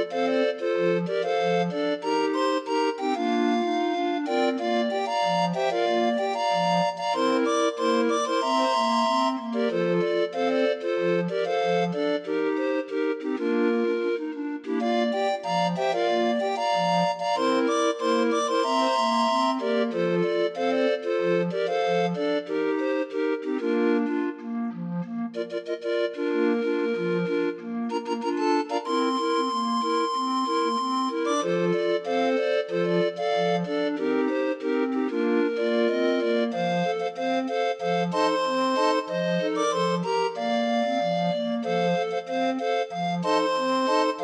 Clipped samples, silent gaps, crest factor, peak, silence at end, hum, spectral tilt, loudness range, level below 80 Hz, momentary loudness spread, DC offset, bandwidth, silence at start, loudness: under 0.1%; none; 14 dB; -10 dBFS; 0 s; none; -5.5 dB/octave; 3 LU; -80 dBFS; 4 LU; under 0.1%; 10.5 kHz; 0 s; -25 LUFS